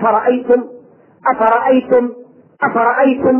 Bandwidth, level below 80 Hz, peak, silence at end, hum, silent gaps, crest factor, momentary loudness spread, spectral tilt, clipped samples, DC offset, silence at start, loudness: 3.5 kHz; -56 dBFS; -2 dBFS; 0 s; none; none; 12 dB; 8 LU; -9 dB/octave; under 0.1%; under 0.1%; 0 s; -14 LUFS